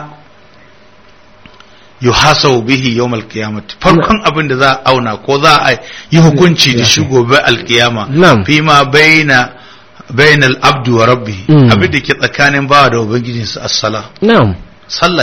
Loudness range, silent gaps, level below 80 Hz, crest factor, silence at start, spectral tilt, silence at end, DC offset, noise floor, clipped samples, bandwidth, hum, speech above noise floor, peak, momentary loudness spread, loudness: 4 LU; none; -36 dBFS; 10 dB; 0 s; -4.5 dB/octave; 0 s; 0.7%; -42 dBFS; 1%; 16.5 kHz; none; 33 dB; 0 dBFS; 9 LU; -8 LUFS